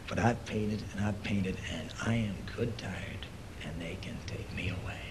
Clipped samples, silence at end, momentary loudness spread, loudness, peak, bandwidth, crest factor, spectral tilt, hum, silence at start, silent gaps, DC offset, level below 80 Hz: under 0.1%; 0 s; 10 LU; -36 LUFS; -14 dBFS; 13 kHz; 20 dB; -6 dB/octave; none; 0 s; none; 0.1%; -48 dBFS